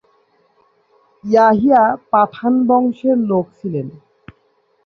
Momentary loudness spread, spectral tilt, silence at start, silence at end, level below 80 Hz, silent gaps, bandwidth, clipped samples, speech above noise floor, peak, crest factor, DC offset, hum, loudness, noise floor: 13 LU; -8.5 dB/octave; 1.25 s; 0.95 s; -58 dBFS; none; 6.4 kHz; under 0.1%; 46 dB; -2 dBFS; 16 dB; under 0.1%; none; -15 LUFS; -60 dBFS